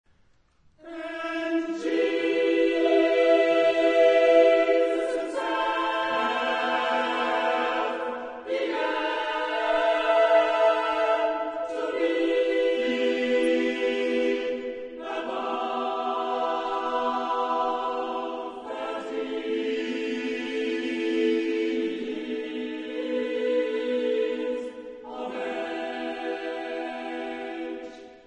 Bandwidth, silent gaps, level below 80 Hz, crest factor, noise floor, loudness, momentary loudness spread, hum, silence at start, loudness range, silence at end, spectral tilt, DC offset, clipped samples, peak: 10.5 kHz; none; -68 dBFS; 18 dB; -62 dBFS; -26 LUFS; 13 LU; none; 0.85 s; 8 LU; 0.1 s; -3.5 dB/octave; under 0.1%; under 0.1%; -8 dBFS